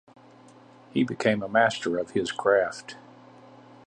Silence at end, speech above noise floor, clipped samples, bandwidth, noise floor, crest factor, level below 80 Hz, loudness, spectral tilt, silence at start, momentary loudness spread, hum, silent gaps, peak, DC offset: 0.9 s; 27 dB; under 0.1%; 10 kHz; -52 dBFS; 20 dB; -66 dBFS; -25 LUFS; -5 dB/octave; 0.95 s; 15 LU; none; none; -8 dBFS; under 0.1%